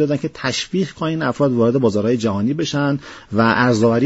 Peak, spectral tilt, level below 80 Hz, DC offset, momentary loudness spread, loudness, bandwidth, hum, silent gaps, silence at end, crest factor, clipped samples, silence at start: -2 dBFS; -5 dB/octave; -52 dBFS; under 0.1%; 7 LU; -18 LUFS; 8 kHz; none; none; 0 s; 16 dB; under 0.1%; 0 s